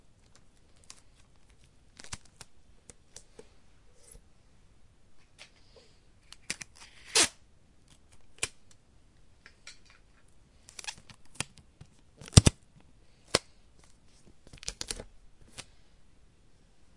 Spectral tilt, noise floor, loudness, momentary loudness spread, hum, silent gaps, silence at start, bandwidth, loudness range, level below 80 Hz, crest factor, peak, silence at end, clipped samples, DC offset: -3.5 dB/octave; -61 dBFS; -30 LUFS; 30 LU; none; none; 2.05 s; 11.5 kHz; 22 LU; -48 dBFS; 36 dB; 0 dBFS; 1.35 s; under 0.1%; under 0.1%